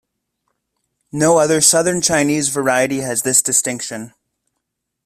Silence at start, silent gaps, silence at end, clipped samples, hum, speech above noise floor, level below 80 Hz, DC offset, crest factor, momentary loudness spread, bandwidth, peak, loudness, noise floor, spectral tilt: 1.15 s; none; 0.95 s; under 0.1%; none; 61 dB; -56 dBFS; under 0.1%; 18 dB; 13 LU; 16 kHz; 0 dBFS; -14 LUFS; -76 dBFS; -3 dB/octave